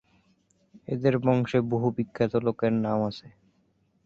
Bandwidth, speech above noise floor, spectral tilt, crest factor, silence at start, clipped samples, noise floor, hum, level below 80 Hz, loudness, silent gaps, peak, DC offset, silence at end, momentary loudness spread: 7.4 kHz; 43 dB; -8.5 dB/octave; 18 dB; 0.9 s; under 0.1%; -68 dBFS; none; -60 dBFS; -26 LUFS; none; -8 dBFS; under 0.1%; 0.75 s; 10 LU